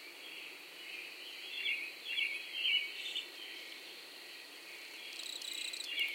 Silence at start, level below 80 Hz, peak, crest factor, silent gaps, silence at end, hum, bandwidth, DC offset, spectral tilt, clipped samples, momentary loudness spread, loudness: 0 s; under -90 dBFS; -22 dBFS; 20 dB; none; 0 s; none; 17 kHz; under 0.1%; 2 dB/octave; under 0.1%; 15 LU; -39 LUFS